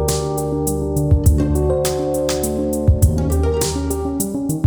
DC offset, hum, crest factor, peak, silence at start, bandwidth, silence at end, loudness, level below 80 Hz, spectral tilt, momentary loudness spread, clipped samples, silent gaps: under 0.1%; none; 16 dB; -2 dBFS; 0 s; over 20 kHz; 0 s; -18 LUFS; -22 dBFS; -6 dB/octave; 5 LU; under 0.1%; none